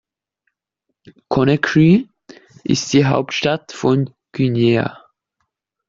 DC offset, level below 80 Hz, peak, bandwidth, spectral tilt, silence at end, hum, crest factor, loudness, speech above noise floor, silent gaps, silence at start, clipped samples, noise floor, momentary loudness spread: under 0.1%; -52 dBFS; -2 dBFS; 7.6 kHz; -6 dB/octave; 0.95 s; none; 16 dB; -17 LUFS; 60 dB; none; 1.3 s; under 0.1%; -76 dBFS; 10 LU